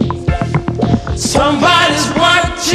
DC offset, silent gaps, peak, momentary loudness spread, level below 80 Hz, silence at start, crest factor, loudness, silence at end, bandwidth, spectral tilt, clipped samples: under 0.1%; none; 0 dBFS; 7 LU; -26 dBFS; 0 s; 12 dB; -12 LUFS; 0 s; 14 kHz; -4 dB/octave; under 0.1%